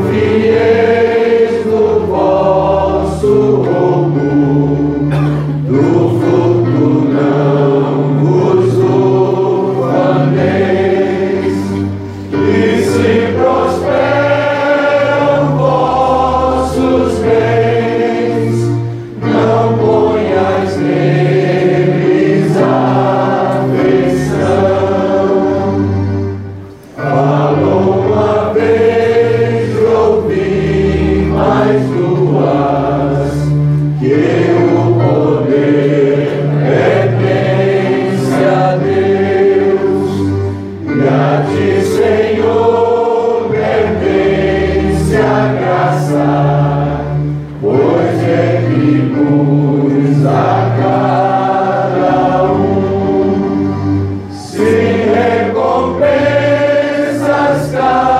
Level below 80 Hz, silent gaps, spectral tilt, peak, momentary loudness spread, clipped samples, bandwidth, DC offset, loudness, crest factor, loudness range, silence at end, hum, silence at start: -34 dBFS; none; -8 dB/octave; 0 dBFS; 4 LU; under 0.1%; 12.5 kHz; under 0.1%; -11 LUFS; 10 dB; 2 LU; 0 s; none; 0 s